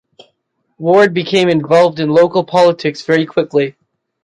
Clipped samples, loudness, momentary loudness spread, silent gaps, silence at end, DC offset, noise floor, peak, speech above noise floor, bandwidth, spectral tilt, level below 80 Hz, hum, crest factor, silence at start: under 0.1%; -13 LUFS; 6 LU; none; 0.55 s; under 0.1%; -66 dBFS; -2 dBFS; 54 dB; 10.5 kHz; -6 dB/octave; -60 dBFS; none; 12 dB; 0.8 s